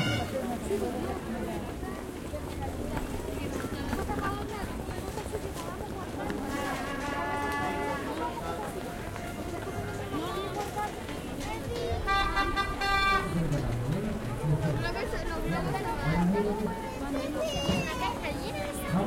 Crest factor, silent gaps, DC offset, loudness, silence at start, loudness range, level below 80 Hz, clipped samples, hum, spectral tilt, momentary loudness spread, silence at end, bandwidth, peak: 18 dB; none; under 0.1%; -32 LUFS; 0 s; 6 LU; -42 dBFS; under 0.1%; none; -5.5 dB/octave; 9 LU; 0 s; 16.5 kHz; -14 dBFS